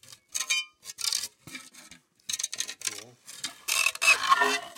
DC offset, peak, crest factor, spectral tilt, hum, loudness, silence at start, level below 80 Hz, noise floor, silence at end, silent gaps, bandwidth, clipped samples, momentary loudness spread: under 0.1%; -8 dBFS; 22 dB; 1.5 dB/octave; none; -26 LUFS; 0.35 s; -76 dBFS; -54 dBFS; 0.05 s; none; 17 kHz; under 0.1%; 22 LU